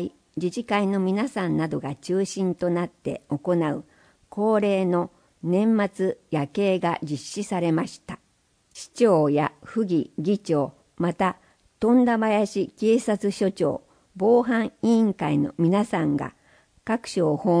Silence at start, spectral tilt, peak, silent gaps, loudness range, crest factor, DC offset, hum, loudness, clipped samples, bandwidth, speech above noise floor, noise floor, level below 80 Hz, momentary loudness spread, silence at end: 0 s; -7 dB/octave; -8 dBFS; none; 3 LU; 16 dB; under 0.1%; none; -24 LUFS; under 0.1%; 10.5 kHz; 42 dB; -65 dBFS; -62 dBFS; 11 LU; 0 s